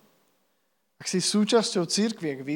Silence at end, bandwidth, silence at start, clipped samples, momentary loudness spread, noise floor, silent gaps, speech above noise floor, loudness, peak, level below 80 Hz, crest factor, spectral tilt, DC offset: 0 s; 16.5 kHz; 1 s; under 0.1%; 9 LU; -74 dBFS; none; 49 dB; -25 LUFS; -8 dBFS; -88 dBFS; 18 dB; -4 dB/octave; under 0.1%